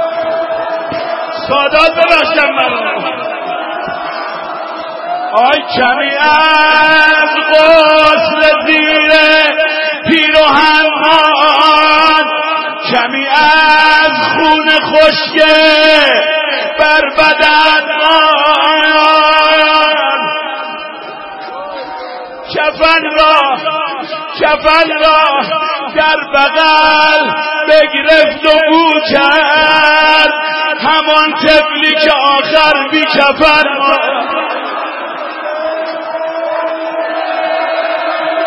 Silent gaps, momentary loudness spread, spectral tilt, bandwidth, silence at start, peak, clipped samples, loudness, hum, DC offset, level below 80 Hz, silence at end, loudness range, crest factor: none; 13 LU; -3.5 dB/octave; 11 kHz; 0 s; 0 dBFS; 0.4%; -8 LUFS; none; under 0.1%; -42 dBFS; 0 s; 7 LU; 10 dB